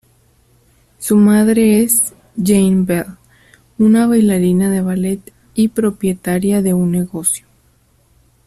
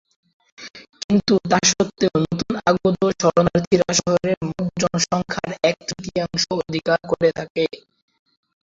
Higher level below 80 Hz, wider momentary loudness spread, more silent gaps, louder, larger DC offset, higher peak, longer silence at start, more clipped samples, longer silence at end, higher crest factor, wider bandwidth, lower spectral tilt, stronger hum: about the same, -48 dBFS vs -50 dBFS; about the same, 10 LU vs 9 LU; second, none vs 1.04-1.09 s, 3.67-3.71 s, 4.37-4.41 s, 7.50-7.55 s; first, -14 LUFS vs -20 LUFS; neither; about the same, 0 dBFS vs -2 dBFS; first, 1 s vs 0.6 s; neither; first, 1.1 s vs 0.85 s; about the same, 14 dB vs 18 dB; first, 14 kHz vs 7.8 kHz; first, -6 dB/octave vs -4 dB/octave; neither